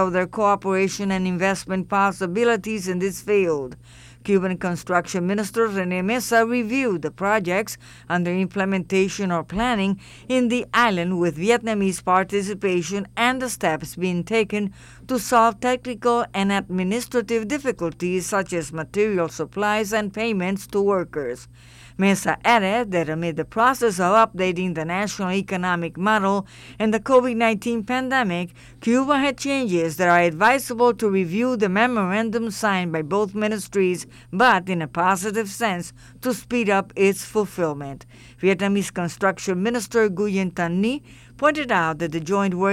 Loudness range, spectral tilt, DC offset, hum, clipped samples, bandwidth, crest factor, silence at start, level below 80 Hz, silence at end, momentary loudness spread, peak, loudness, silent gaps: 3 LU; -5 dB/octave; under 0.1%; none; under 0.1%; 15.5 kHz; 16 dB; 0 s; -52 dBFS; 0 s; 8 LU; -6 dBFS; -22 LUFS; none